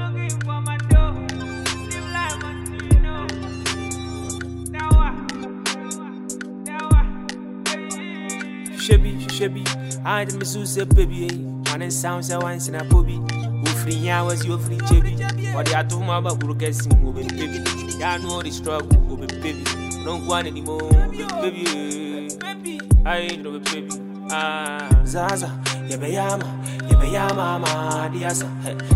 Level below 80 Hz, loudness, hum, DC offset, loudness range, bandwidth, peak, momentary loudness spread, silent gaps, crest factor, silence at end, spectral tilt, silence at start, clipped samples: -24 dBFS; -22 LUFS; none; under 0.1%; 3 LU; 16 kHz; -2 dBFS; 11 LU; none; 18 dB; 0 s; -5 dB/octave; 0 s; under 0.1%